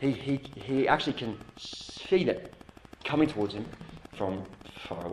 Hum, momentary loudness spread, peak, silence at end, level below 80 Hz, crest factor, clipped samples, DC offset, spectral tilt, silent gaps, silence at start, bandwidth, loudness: none; 18 LU; -8 dBFS; 0 s; -56 dBFS; 24 dB; under 0.1%; under 0.1%; -6 dB/octave; none; 0 s; 12 kHz; -31 LUFS